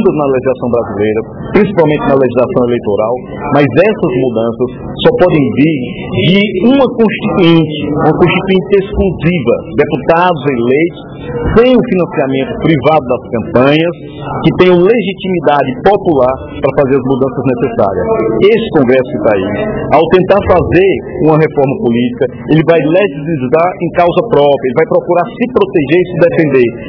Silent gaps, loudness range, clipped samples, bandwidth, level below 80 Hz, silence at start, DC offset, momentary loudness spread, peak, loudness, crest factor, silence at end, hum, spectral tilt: none; 2 LU; 1%; 5.4 kHz; -34 dBFS; 0 s; under 0.1%; 6 LU; 0 dBFS; -10 LUFS; 10 dB; 0 s; none; -9.5 dB/octave